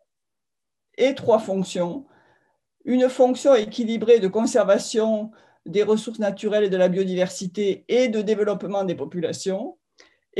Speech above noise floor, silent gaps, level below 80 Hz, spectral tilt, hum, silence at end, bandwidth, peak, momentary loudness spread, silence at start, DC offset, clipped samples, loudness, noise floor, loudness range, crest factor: 66 dB; none; -72 dBFS; -5.5 dB/octave; none; 0 s; 12 kHz; -6 dBFS; 10 LU; 1 s; under 0.1%; under 0.1%; -22 LUFS; -87 dBFS; 4 LU; 16 dB